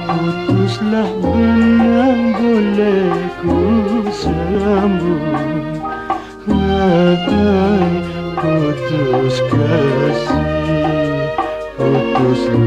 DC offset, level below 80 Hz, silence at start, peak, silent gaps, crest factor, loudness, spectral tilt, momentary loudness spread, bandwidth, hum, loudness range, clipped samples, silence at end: under 0.1%; -34 dBFS; 0 s; 0 dBFS; none; 14 dB; -15 LUFS; -7.5 dB/octave; 7 LU; 9.2 kHz; none; 3 LU; under 0.1%; 0 s